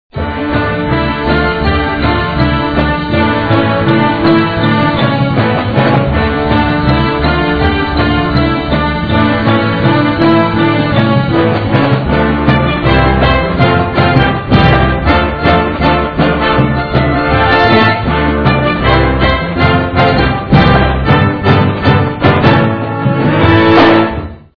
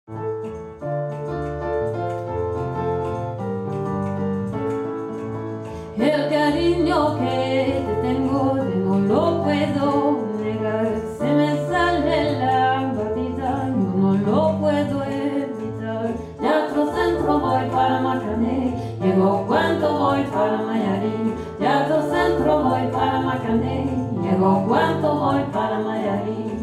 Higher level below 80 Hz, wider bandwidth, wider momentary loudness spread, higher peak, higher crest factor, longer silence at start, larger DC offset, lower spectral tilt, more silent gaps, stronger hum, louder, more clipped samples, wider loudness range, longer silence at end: first, -22 dBFS vs -46 dBFS; second, 5.4 kHz vs 12 kHz; second, 4 LU vs 8 LU; first, 0 dBFS vs -6 dBFS; second, 10 dB vs 16 dB; about the same, 0.15 s vs 0.1 s; first, 1% vs under 0.1%; first, -9 dB/octave vs -7.5 dB/octave; neither; neither; first, -10 LUFS vs -21 LUFS; first, 0.4% vs under 0.1%; second, 2 LU vs 5 LU; first, 0.2 s vs 0 s